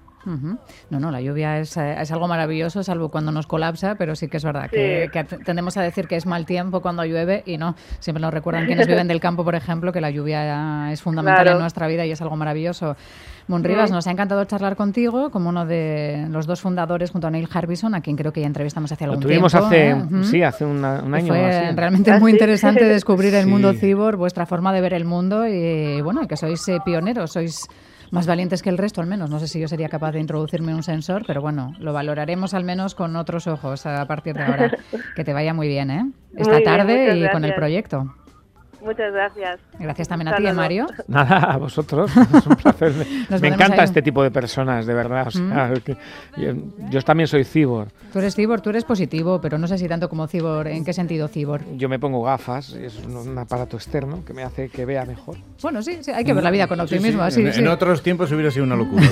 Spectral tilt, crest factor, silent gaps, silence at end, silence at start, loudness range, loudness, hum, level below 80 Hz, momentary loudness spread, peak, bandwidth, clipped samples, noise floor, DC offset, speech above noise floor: -7 dB/octave; 20 dB; none; 0 s; 0.25 s; 9 LU; -20 LUFS; none; -48 dBFS; 13 LU; 0 dBFS; 14 kHz; under 0.1%; -49 dBFS; under 0.1%; 30 dB